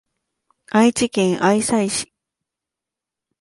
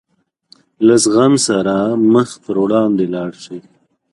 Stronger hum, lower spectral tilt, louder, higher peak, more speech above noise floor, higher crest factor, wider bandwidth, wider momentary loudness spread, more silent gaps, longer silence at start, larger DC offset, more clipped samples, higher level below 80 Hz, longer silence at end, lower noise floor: neither; about the same, -4.5 dB/octave vs -5 dB/octave; second, -18 LUFS vs -14 LUFS; second, -4 dBFS vs 0 dBFS; first, 69 dB vs 38 dB; about the same, 16 dB vs 14 dB; about the same, 11.5 kHz vs 11.5 kHz; second, 7 LU vs 15 LU; neither; about the same, 0.75 s vs 0.8 s; neither; neither; about the same, -58 dBFS vs -56 dBFS; first, 1.35 s vs 0.55 s; first, -86 dBFS vs -51 dBFS